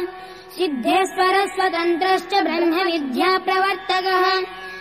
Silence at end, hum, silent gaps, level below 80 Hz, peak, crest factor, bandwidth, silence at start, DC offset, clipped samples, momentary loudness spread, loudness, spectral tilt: 0 s; none; none; -60 dBFS; -8 dBFS; 12 dB; 15.5 kHz; 0 s; 0.1%; under 0.1%; 7 LU; -19 LUFS; -3 dB/octave